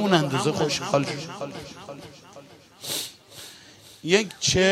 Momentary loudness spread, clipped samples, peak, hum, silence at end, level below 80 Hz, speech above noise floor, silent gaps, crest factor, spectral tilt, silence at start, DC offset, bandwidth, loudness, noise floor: 23 LU; under 0.1%; -6 dBFS; none; 0 s; -56 dBFS; 25 dB; none; 20 dB; -4 dB/octave; 0 s; under 0.1%; 16 kHz; -25 LUFS; -49 dBFS